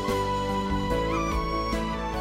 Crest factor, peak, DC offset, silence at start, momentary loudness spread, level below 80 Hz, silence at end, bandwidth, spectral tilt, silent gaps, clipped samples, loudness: 12 dB; -14 dBFS; under 0.1%; 0 s; 2 LU; -34 dBFS; 0 s; 16 kHz; -5.5 dB/octave; none; under 0.1%; -28 LUFS